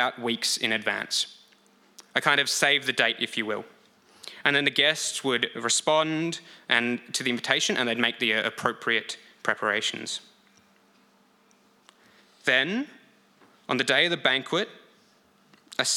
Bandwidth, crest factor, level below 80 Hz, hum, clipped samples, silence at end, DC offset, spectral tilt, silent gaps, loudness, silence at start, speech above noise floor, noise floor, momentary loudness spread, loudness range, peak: 17 kHz; 26 dB; -80 dBFS; none; under 0.1%; 0 s; under 0.1%; -2 dB/octave; none; -25 LUFS; 0 s; 36 dB; -62 dBFS; 12 LU; 7 LU; -2 dBFS